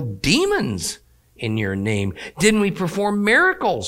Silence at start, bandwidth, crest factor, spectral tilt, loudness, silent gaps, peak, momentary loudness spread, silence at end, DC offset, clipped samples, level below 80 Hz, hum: 0 s; 16.5 kHz; 18 dB; -4.5 dB/octave; -19 LUFS; none; -2 dBFS; 12 LU; 0 s; under 0.1%; under 0.1%; -44 dBFS; none